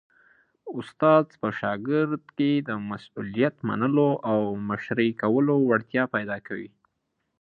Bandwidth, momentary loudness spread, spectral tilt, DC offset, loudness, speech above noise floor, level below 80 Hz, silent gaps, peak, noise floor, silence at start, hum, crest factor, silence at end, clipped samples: 4.8 kHz; 15 LU; -9 dB/octave; under 0.1%; -25 LUFS; 53 dB; -66 dBFS; none; -6 dBFS; -77 dBFS; 0.65 s; none; 18 dB; 0.75 s; under 0.1%